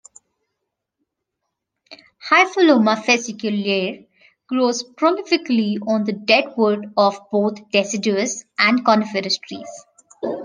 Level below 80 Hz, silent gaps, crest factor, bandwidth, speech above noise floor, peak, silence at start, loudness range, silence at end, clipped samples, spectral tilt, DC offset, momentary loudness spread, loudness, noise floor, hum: -72 dBFS; none; 20 dB; 10 kHz; 60 dB; 0 dBFS; 1.9 s; 2 LU; 0 s; under 0.1%; -4 dB/octave; under 0.1%; 12 LU; -18 LUFS; -79 dBFS; none